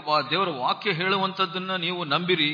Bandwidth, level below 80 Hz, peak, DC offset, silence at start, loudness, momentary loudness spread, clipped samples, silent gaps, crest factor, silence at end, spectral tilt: 5.2 kHz; -74 dBFS; -8 dBFS; under 0.1%; 0 s; -24 LUFS; 4 LU; under 0.1%; none; 16 dB; 0 s; -6.5 dB/octave